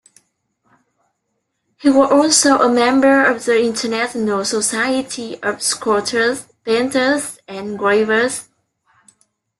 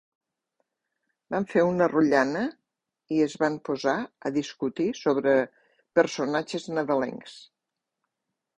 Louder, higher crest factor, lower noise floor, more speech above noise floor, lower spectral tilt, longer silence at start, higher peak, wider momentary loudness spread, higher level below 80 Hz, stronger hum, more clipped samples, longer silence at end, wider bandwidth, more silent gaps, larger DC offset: first, -16 LUFS vs -26 LUFS; about the same, 16 dB vs 20 dB; second, -72 dBFS vs -85 dBFS; second, 56 dB vs 60 dB; second, -2.5 dB/octave vs -5.5 dB/octave; first, 1.8 s vs 1.3 s; first, -2 dBFS vs -8 dBFS; about the same, 11 LU vs 10 LU; first, -60 dBFS vs -68 dBFS; neither; neither; about the same, 1.2 s vs 1.15 s; first, 12.5 kHz vs 10 kHz; neither; neither